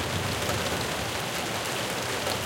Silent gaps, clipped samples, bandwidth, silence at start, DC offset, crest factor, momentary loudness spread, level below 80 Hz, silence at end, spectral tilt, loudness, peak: none; under 0.1%; 17 kHz; 0 s; under 0.1%; 18 dB; 2 LU; -50 dBFS; 0 s; -3 dB/octave; -28 LUFS; -12 dBFS